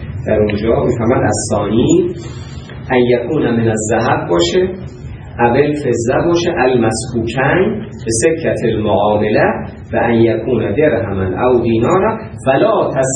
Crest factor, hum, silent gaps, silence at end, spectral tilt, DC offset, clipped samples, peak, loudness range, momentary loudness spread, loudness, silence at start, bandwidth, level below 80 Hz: 14 dB; none; none; 0 s; -5.5 dB/octave; under 0.1%; under 0.1%; 0 dBFS; 1 LU; 8 LU; -14 LUFS; 0 s; 10.5 kHz; -36 dBFS